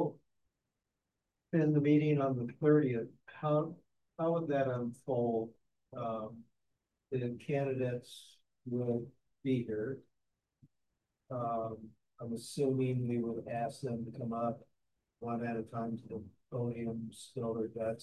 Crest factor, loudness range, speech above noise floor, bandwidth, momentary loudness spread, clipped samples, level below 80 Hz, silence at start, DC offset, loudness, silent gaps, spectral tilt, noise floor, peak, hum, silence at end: 20 dB; 8 LU; 53 dB; 12.5 kHz; 17 LU; under 0.1%; -72 dBFS; 0 s; under 0.1%; -36 LUFS; none; -8 dB/octave; -88 dBFS; -16 dBFS; none; 0 s